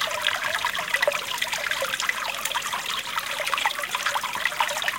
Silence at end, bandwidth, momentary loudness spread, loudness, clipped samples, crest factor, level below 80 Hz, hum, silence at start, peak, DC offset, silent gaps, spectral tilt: 0 s; 17 kHz; 3 LU; -25 LUFS; under 0.1%; 22 dB; -62 dBFS; none; 0 s; -4 dBFS; under 0.1%; none; 0.5 dB/octave